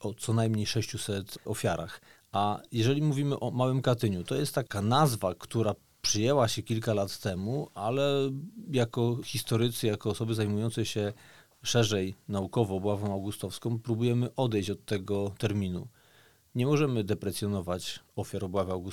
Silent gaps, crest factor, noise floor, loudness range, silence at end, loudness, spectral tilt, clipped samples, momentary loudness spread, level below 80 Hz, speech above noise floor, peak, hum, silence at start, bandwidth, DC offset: none; 20 dB; -62 dBFS; 3 LU; 0 s; -30 LUFS; -5.5 dB/octave; under 0.1%; 9 LU; -62 dBFS; 32 dB; -10 dBFS; none; 0 s; 17.5 kHz; 0.2%